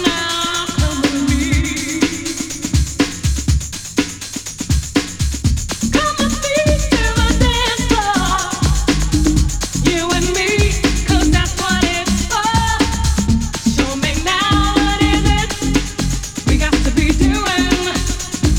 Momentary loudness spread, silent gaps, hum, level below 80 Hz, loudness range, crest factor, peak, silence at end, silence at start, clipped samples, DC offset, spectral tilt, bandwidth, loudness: 6 LU; none; none; -22 dBFS; 3 LU; 14 dB; -2 dBFS; 0 s; 0 s; under 0.1%; under 0.1%; -4 dB/octave; 18 kHz; -16 LUFS